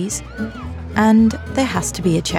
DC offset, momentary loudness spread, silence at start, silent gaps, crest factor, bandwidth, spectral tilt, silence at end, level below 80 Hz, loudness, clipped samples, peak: under 0.1%; 15 LU; 0 s; none; 14 dB; 14.5 kHz; -5 dB/octave; 0 s; -38 dBFS; -18 LUFS; under 0.1%; -4 dBFS